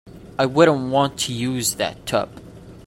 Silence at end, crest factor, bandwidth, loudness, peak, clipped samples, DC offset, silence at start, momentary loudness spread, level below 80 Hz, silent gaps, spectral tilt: 0.05 s; 18 dB; 16.5 kHz; -20 LUFS; -2 dBFS; under 0.1%; under 0.1%; 0.05 s; 9 LU; -52 dBFS; none; -4 dB/octave